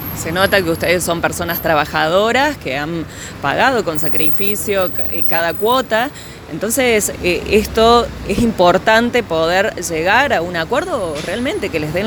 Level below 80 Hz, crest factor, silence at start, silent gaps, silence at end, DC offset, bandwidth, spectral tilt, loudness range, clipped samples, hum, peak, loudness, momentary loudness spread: -36 dBFS; 16 dB; 0 s; none; 0 s; under 0.1%; over 20 kHz; -4 dB/octave; 2 LU; under 0.1%; none; 0 dBFS; -15 LUFS; 9 LU